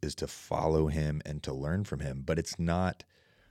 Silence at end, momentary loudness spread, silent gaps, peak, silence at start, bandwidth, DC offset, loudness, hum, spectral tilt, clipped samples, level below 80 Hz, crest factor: 0.55 s; 8 LU; none; -14 dBFS; 0 s; 14.5 kHz; under 0.1%; -33 LUFS; none; -6 dB/octave; under 0.1%; -44 dBFS; 18 dB